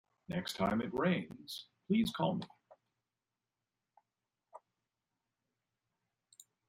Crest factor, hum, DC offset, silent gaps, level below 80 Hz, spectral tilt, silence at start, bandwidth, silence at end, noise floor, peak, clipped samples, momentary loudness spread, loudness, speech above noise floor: 20 dB; none; under 0.1%; none; -70 dBFS; -6 dB/octave; 0.3 s; 16 kHz; 2.1 s; under -90 dBFS; -20 dBFS; under 0.1%; 13 LU; -37 LUFS; over 54 dB